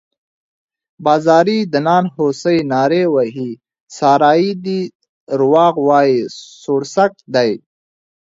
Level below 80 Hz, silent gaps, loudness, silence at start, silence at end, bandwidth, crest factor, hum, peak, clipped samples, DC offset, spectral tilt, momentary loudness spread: -62 dBFS; 3.80-3.87 s, 4.95-5.00 s, 5.09-5.27 s; -14 LUFS; 1 s; 0.75 s; 7.8 kHz; 16 dB; none; 0 dBFS; under 0.1%; under 0.1%; -6 dB/octave; 13 LU